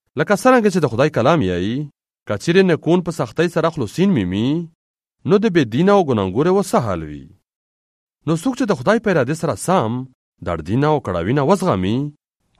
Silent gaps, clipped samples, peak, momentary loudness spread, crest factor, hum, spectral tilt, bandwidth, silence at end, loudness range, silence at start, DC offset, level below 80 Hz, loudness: 2.22-2.26 s, 4.75-4.94 s, 7.55-8.07 s, 10.15-10.32 s; under 0.1%; 0 dBFS; 12 LU; 18 dB; none; -6.5 dB/octave; 14 kHz; 0.5 s; 3 LU; 0.15 s; under 0.1%; -50 dBFS; -18 LUFS